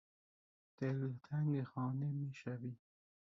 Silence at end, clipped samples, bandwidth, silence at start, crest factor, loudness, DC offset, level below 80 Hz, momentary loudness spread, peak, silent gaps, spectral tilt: 0.45 s; under 0.1%; 7.2 kHz; 0.8 s; 14 dB; -42 LUFS; under 0.1%; -82 dBFS; 9 LU; -28 dBFS; none; -9 dB/octave